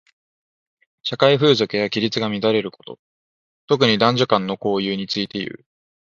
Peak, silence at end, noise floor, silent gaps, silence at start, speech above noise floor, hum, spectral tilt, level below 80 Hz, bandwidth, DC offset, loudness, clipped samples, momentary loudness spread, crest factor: 0 dBFS; 0.55 s; under -90 dBFS; 2.99-3.68 s; 1.05 s; over 71 dB; none; -5.5 dB/octave; -62 dBFS; 7.4 kHz; under 0.1%; -19 LUFS; under 0.1%; 14 LU; 20 dB